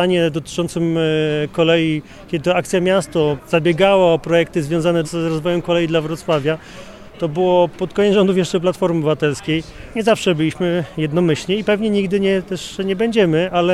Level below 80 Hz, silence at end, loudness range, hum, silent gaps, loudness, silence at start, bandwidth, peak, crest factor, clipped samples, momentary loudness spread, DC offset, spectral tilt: -46 dBFS; 0 s; 2 LU; none; none; -17 LUFS; 0 s; 13.5 kHz; -2 dBFS; 16 dB; under 0.1%; 8 LU; under 0.1%; -6 dB/octave